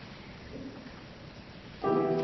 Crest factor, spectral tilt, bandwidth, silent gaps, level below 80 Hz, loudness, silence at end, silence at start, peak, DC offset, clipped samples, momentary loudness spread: 18 dB; -7.5 dB/octave; 6.2 kHz; none; -58 dBFS; -35 LUFS; 0 s; 0 s; -16 dBFS; under 0.1%; under 0.1%; 18 LU